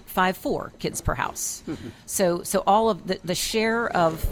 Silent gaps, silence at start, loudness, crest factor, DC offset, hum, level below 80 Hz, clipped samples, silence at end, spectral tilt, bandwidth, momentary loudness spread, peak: none; 0.1 s; -24 LUFS; 18 dB; under 0.1%; none; -42 dBFS; under 0.1%; 0 s; -4 dB/octave; over 20 kHz; 9 LU; -8 dBFS